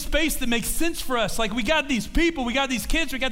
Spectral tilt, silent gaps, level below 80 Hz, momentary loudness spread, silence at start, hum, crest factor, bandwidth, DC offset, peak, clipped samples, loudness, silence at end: -3 dB/octave; none; -32 dBFS; 3 LU; 0 s; none; 16 dB; 16 kHz; under 0.1%; -8 dBFS; under 0.1%; -24 LUFS; 0 s